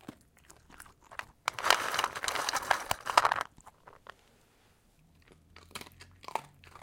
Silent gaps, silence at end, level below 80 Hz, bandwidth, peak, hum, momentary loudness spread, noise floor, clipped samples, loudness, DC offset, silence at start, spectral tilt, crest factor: none; 0.35 s; -64 dBFS; 17 kHz; -2 dBFS; none; 26 LU; -66 dBFS; under 0.1%; -31 LUFS; under 0.1%; 0.1 s; -0.5 dB/octave; 34 dB